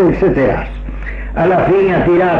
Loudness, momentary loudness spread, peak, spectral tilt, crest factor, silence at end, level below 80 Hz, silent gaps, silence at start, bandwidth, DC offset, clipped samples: -13 LUFS; 14 LU; -4 dBFS; -9 dB/octave; 10 dB; 0 s; -26 dBFS; none; 0 s; 5.6 kHz; under 0.1%; under 0.1%